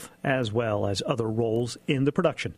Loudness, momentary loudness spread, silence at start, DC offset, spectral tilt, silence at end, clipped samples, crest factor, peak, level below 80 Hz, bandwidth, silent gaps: -27 LUFS; 3 LU; 0 s; under 0.1%; -6 dB/octave; 0.05 s; under 0.1%; 18 dB; -8 dBFS; -58 dBFS; 15 kHz; none